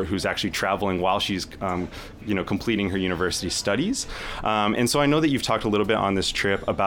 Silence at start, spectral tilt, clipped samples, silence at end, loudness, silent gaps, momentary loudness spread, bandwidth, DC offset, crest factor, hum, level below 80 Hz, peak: 0 s; -4 dB/octave; under 0.1%; 0 s; -24 LUFS; none; 8 LU; 18 kHz; under 0.1%; 14 dB; none; -44 dBFS; -10 dBFS